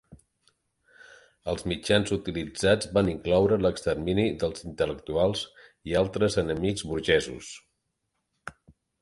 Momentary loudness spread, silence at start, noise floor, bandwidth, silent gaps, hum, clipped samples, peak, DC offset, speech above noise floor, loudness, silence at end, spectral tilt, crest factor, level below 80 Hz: 17 LU; 0.1 s; -79 dBFS; 11.5 kHz; none; none; under 0.1%; -6 dBFS; under 0.1%; 53 dB; -27 LUFS; 0.5 s; -5 dB/octave; 22 dB; -48 dBFS